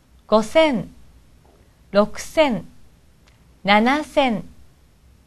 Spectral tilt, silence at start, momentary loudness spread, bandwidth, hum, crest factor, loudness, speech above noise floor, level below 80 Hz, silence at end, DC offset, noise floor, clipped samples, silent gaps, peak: -5 dB/octave; 0.3 s; 12 LU; 13 kHz; none; 22 dB; -19 LUFS; 35 dB; -48 dBFS; 0.75 s; under 0.1%; -53 dBFS; under 0.1%; none; 0 dBFS